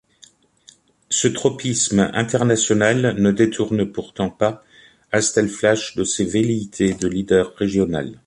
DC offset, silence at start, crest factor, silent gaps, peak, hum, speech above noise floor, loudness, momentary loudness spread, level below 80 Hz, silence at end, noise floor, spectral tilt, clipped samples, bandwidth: under 0.1%; 1.1 s; 16 dB; none; -2 dBFS; none; 33 dB; -19 LUFS; 6 LU; -48 dBFS; 0.1 s; -52 dBFS; -4.5 dB/octave; under 0.1%; 11.5 kHz